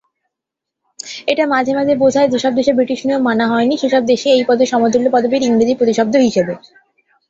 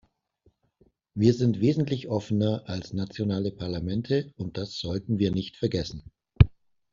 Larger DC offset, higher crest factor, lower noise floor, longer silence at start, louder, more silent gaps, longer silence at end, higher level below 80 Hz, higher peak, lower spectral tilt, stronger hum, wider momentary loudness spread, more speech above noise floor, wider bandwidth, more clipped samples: neither; second, 14 dB vs 26 dB; first, -81 dBFS vs -67 dBFS; about the same, 1.05 s vs 1.15 s; first, -14 LUFS vs -27 LUFS; neither; first, 0.7 s vs 0.45 s; second, -56 dBFS vs -42 dBFS; about the same, -2 dBFS vs -2 dBFS; second, -4.5 dB/octave vs -7.5 dB/octave; neither; second, 6 LU vs 11 LU; first, 68 dB vs 40 dB; about the same, 8 kHz vs 7.4 kHz; neither